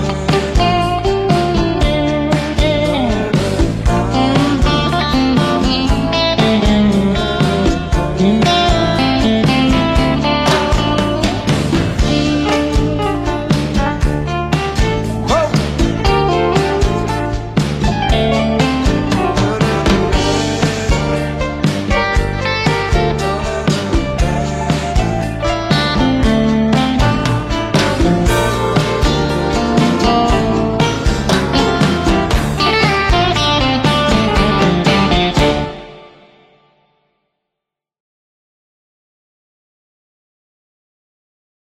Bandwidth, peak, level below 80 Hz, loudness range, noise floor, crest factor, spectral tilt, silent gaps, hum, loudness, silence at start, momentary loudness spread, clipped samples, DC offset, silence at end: 14.5 kHz; -2 dBFS; -22 dBFS; 3 LU; -82 dBFS; 12 dB; -5.5 dB/octave; none; none; -14 LUFS; 0 s; 5 LU; under 0.1%; under 0.1%; 5.65 s